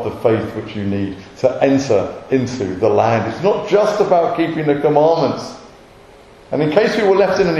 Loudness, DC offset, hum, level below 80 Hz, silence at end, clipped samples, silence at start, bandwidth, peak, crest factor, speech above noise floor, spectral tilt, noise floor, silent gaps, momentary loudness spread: -16 LUFS; under 0.1%; none; -50 dBFS; 0 s; under 0.1%; 0 s; 12 kHz; 0 dBFS; 16 dB; 27 dB; -6.5 dB/octave; -43 dBFS; none; 9 LU